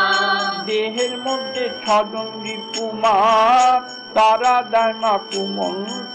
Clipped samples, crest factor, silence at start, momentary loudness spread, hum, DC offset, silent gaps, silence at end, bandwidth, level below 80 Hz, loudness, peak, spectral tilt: under 0.1%; 12 dB; 0 s; 12 LU; none; under 0.1%; none; 0 s; 10 kHz; -60 dBFS; -18 LUFS; -6 dBFS; -2.5 dB/octave